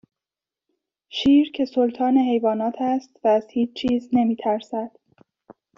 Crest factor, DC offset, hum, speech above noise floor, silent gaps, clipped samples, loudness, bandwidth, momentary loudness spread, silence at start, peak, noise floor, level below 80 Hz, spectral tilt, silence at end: 14 dB; under 0.1%; none; 69 dB; none; under 0.1%; -22 LUFS; 7.2 kHz; 8 LU; 1.15 s; -8 dBFS; -90 dBFS; -60 dBFS; -4 dB/octave; 0.9 s